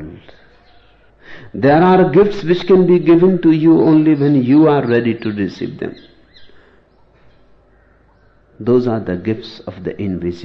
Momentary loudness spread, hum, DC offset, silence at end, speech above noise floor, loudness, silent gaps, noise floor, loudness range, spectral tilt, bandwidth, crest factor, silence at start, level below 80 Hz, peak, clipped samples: 16 LU; none; under 0.1%; 0 s; 38 dB; -13 LUFS; none; -51 dBFS; 14 LU; -9.5 dB/octave; 6.2 kHz; 14 dB; 0 s; -46 dBFS; -2 dBFS; under 0.1%